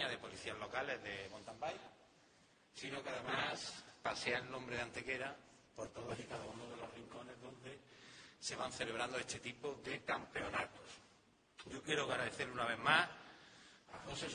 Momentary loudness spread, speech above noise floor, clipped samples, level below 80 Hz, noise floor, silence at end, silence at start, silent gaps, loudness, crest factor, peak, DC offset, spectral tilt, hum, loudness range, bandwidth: 19 LU; 27 dB; under 0.1%; -72 dBFS; -71 dBFS; 0 s; 0 s; none; -43 LUFS; 28 dB; -16 dBFS; under 0.1%; -3 dB/octave; none; 8 LU; 10 kHz